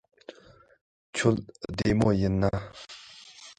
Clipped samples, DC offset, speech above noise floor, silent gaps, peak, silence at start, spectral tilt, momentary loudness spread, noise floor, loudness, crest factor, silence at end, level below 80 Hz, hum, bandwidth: under 0.1%; under 0.1%; 30 dB; 0.81-1.13 s; -8 dBFS; 0.3 s; -6.5 dB/octave; 22 LU; -56 dBFS; -27 LUFS; 20 dB; 0.05 s; -46 dBFS; none; 10.5 kHz